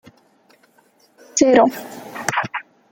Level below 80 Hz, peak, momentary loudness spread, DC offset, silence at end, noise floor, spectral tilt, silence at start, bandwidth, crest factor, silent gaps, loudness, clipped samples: -62 dBFS; 0 dBFS; 19 LU; under 0.1%; 0.3 s; -57 dBFS; -3.5 dB/octave; 1.35 s; 17 kHz; 20 dB; none; -18 LUFS; under 0.1%